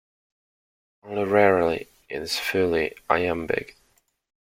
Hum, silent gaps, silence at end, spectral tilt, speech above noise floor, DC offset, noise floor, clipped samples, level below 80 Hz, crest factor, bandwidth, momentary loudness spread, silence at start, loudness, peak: none; none; 0.85 s; -5 dB/octave; 43 dB; under 0.1%; -66 dBFS; under 0.1%; -56 dBFS; 24 dB; 16.5 kHz; 14 LU; 1.05 s; -24 LUFS; -2 dBFS